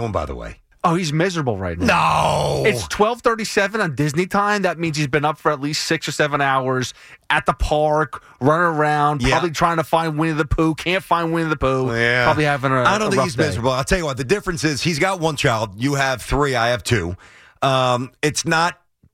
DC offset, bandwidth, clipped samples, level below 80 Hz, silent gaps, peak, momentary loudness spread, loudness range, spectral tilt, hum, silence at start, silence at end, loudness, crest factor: under 0.1%; 16.5 kHz; under 0.1%; -36 dBFS; none; -4 dBFS; 5 LU; 2 LU; -5 dB/octave; none; 0 s; 0.4 s; -19 LUFS; 14 dB